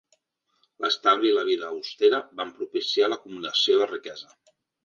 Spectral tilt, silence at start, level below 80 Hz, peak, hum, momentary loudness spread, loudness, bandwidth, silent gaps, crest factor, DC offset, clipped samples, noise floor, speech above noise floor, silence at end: -2.5 dB/octave; 0.8 s; -78 dBFS; -8 dBFS; none; 13 LU; -24 LUFS; 7.4 kHz; none; 18 dB; under 0.1%; under 0.1%; -72 dBFS; 47 dB; 0.65 s